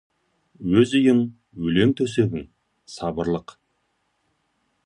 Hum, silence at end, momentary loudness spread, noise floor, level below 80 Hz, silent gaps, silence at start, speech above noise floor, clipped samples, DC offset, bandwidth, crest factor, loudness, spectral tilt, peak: none; 1.45 s; 14 LU; -71 dBFS; -52 dBFS; none; 0.6 s; 50 dB; under 0.1%; under 0.1%; 11 kHz; 20 dB; -22 LUFS; -6.5 dB/octave; -4 dBFS